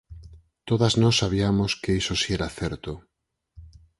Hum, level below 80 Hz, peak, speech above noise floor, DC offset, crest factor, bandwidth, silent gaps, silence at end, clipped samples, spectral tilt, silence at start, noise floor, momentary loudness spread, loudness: none; -42 dBFS; -6 dBFS; 28 dB; under 0.1%; 18 dB; 11.5 kHz; none; 0.3 s; under 0.1%; -5 dB/octave; 0.1 s; -52 dBFS; 16 LU; -23 LUFS